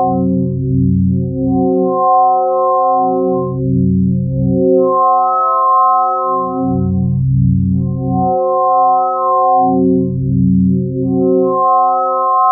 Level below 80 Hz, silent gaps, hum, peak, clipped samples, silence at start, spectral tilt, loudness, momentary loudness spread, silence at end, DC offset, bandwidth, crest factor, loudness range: -36 dBFS; none; none; 0 dBFS; under 0.1%; 0 s; -18.5 dB/octave; -13 LUFS; 5 LU; 0 s; under 0.1%; 1.4 kHz; 12 dB; 1 LU